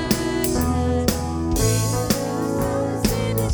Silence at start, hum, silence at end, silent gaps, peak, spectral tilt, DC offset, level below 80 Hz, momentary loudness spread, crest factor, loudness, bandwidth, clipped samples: 0 s; none; 0 s; none; -4 dBFS; -5 dB/octave; under 0.1%; -32 dBFS; 3 LU; 16 dB; -22 LUFS; over 20 kHz; under 0.1%